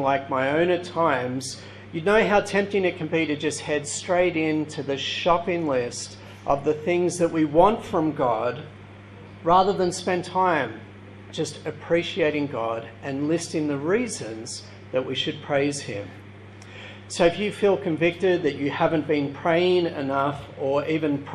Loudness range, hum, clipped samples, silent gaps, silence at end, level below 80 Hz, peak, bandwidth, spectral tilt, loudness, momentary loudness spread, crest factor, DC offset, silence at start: 4 LU; none; under 0.1%; none; 0 s; -54 dBFS; -4 dBFS; 12 kHz; -5 dB/octave; -24 LUFS; 15 LU; 20 dB; under 0.1%; 0 s